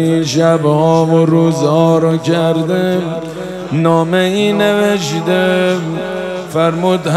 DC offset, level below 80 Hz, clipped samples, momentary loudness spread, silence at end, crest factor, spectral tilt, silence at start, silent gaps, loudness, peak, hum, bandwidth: under 0.1%; -50 dBFS; under 0.1%; 9 LU; 0 s; 12 dB; -6 dB/octave; 0 s; none; -13 LUFS; 0 dBFS; none; 14 kHz